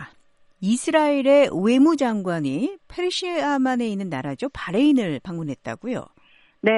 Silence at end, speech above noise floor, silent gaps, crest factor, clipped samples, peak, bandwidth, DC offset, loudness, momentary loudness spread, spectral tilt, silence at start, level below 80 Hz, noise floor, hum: 0 s; 35 dB; none; 16 dB; under 0.1%; -6 dBFS; 11.5 kHz; under 0.1%; -22 LUFS; 13 LU; -5.5 dB/octave; 0 s; -58 dBFS; -56 dBFS; none